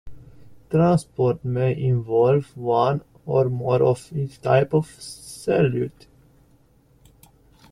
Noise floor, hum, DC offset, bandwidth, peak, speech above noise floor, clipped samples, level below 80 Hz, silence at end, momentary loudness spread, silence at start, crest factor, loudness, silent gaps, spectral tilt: -57 dBFS; none; under 0.1%; 12.5 kHz; -4 dBFS; 36 dB; under 0.1%; -52 dBFS; 1.8 s; 11 LU; 0.05 s; 18 dB; -22 LUFS; none; -7.5 dB/octave